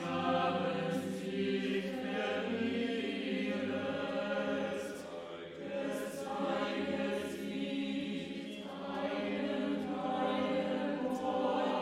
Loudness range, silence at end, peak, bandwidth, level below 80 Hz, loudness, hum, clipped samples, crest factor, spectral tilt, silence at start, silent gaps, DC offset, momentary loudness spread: 3 LU; 0 s; -22 dBFS; 15.5 kHz; -74 dBFS; -36 LUFS; none; under 0.1%; 14 dB; -5.5 dB/octave; 0 s; none; under 0.1%; 8 LU